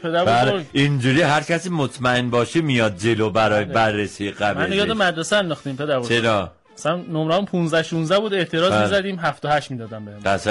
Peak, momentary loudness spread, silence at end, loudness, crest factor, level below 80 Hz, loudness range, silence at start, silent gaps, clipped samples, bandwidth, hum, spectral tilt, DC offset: -8 dBFS; 7 LU; 0 s; -20 LUFS; 12 dB; -52 dBFS; 2 LU; 0 s; none; under 0.1%; 11.5 kHz; none; -5 dB/octave; under 0.1%